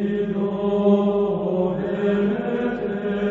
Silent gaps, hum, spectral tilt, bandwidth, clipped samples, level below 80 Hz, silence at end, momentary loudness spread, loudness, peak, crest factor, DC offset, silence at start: none; none; -9.5 dB/octave; 4.1 kHz; under 0.1%; -50 dBFS; 0 s; 6 LU; -22 LUFS; -6 dBFS; 14 dB; under 0.1%; 0 s